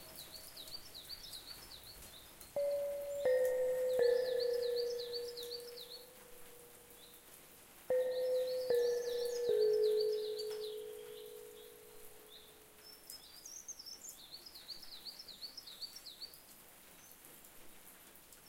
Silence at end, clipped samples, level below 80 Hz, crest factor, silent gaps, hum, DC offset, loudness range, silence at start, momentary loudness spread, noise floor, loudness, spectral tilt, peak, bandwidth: 0 s; under 0.1%; -72 dBFS; 18 dB; none; none; under 0.1%; 15 LU; 0 s; 22 LU; -59 dBFS; -39 LUFS; -1.5 dB/octave; -24 dBFS; 17 kHz